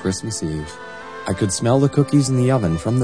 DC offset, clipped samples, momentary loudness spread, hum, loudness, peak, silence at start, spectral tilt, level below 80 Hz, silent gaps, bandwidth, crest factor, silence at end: 0.4%; under 0.1%; 15 LU; none; -19 LUFS; -2 dBFS; 0 s; -6 dB/octave; -44 dBFS; none; 10.5 kHz; 16 dB; 0 s